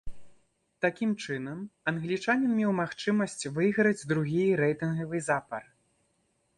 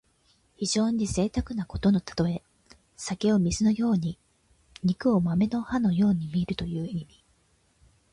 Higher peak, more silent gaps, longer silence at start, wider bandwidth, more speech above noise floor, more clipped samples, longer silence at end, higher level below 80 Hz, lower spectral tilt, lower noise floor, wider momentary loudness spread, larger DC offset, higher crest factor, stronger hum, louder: about the same, -12 dBFS vs -12 dBFS; neither; second, 0.05 s vs 0.6 s; about the same, 11.5 kHz vs 11.5 kHz; first, 45 dB vs 41 dB; neither; second, 0.95 s vs 1.1 s; second, -60 dBFS vs -48 dBFS; about the same, -6 dB/octave vs -6 dB/octave; first, -73 dBFS vs -66 dBFS; second, 8 LU vs 11 LU; neither; about the same, 18 dB vs 14 dB; neither; about the same, -29 LUFS vs -27 LUFS